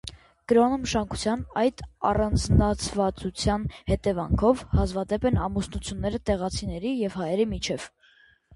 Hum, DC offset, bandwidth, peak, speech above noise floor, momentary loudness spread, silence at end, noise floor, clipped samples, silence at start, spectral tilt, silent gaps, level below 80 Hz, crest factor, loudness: none; under 0.1%; 11.5 kHz; -6 dBFS; 34 dB; 8 LU; 0.65 s; -59 dBFS; under 0.1%; 0.05 s; -6 dB/octave; none; -36 dBFS; 20 dB; -26 LUFS